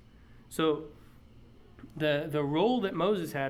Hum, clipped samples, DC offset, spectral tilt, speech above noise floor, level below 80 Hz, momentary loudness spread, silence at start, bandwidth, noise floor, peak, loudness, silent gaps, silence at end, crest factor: none; under 0.1%; under 0.1%; -6 dB/octave; 25 dB; -60 dBFS; 13 LU; 0.3 s; 15.5 kHz; -55 dBFS; -14 dBFS; -30 LUFS; none; 0 s; 16 dB